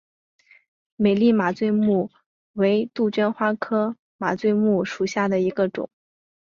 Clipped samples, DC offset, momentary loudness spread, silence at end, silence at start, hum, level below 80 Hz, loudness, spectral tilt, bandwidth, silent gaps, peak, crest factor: under 0.1%; under 0.1%; 9 LU; 0.6 s; 1 s; none; -64 dBFS; -22 LUFS; -7 dB/octave; 7.4 kHz; 2.26-2.54 s, 3.99-4.19 s; -8 dBFS; 16 dB